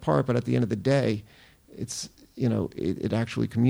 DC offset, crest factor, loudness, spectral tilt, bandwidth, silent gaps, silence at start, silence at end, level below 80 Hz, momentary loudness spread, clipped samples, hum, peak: under 0.1%; 16 dB; -27 LUFS; -6.5 dB/octave; 19.5 kHz; none; 0 s; 0 s; -56 dBFS; 11 LU; under 0.1%; none; -10 dBFS